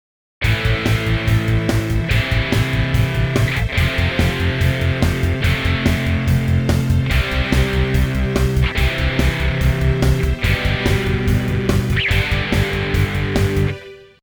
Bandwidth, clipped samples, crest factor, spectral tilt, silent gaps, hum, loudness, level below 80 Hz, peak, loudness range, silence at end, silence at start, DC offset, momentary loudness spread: over 20 kHz; under 0.1%; 16 dB; -6 dB/octave; none; none; -18 LUFS; -24 dBFS; 0 dBFS; 0 LU; 0.2 s; 0.4 s; under 0.1%; 1 LU